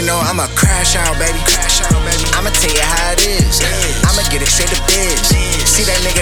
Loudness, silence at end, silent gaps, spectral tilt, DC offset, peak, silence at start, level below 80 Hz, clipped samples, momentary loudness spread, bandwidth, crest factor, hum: -12 LUFS; 0 s; none; -2.5 dB/octave; under 0.1%; 0 dBFS; 0 s; -18 dBFS; under 0.1%; 3 LU; over 20 kHz; 12 dB; none